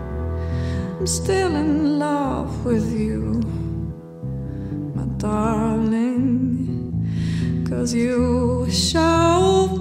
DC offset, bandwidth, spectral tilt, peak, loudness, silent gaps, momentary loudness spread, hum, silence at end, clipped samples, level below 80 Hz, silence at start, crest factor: under 0.1%; 15.5 kHz; -6 dB/octave; -4 dBFS; -21 LUFS; none; 11 LU; none; 0 s; under 0.1%; -34 dBFS; 0 s; 16 dB